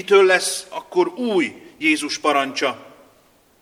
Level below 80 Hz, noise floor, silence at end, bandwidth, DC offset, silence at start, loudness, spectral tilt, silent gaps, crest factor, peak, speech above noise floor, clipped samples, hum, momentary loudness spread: -70 dBFS; -56 dBFS; 0.8 s; 15 kHz; under 0.1%; 0 s; -19 LUFS; -2.5 dB/octave; none; 20 dB; -2 dBFS; 37 dB; under 0.1%; none; 11 LU